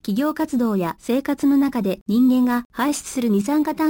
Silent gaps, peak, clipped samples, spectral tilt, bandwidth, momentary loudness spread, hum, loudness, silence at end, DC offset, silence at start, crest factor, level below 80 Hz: 2.01-2.06 s, 2.65-2.70 s; -10 dBFS; under 0.1%; -5.5 dB/octave; 17.5 kHz; 6 LU; none; -20 LUFS; 0 s; under 0.1%; 0.05 s; 10 dB; -54 dBFS